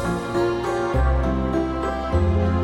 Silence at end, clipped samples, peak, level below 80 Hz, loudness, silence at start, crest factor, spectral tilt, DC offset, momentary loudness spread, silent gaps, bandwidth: 0 s; under 0.1%; -8 dBFS; -26 dBFS; -22 LUFS; 0 s; 12 dB; -7.5 dB/octave; under 0.1%; 3 LU; none; 11 kHz